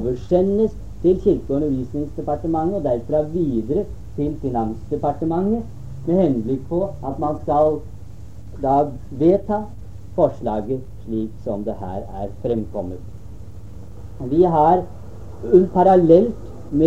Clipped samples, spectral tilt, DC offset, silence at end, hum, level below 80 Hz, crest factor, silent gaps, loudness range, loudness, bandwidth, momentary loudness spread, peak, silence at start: under 0.1%; -10 dB/octave; 2%; 0 s; none; -40 dBFS; 20 dB; none; 7 LU; -20 LUFS; 7.8 kHz; 22 LU; -2 dBFS; 0 s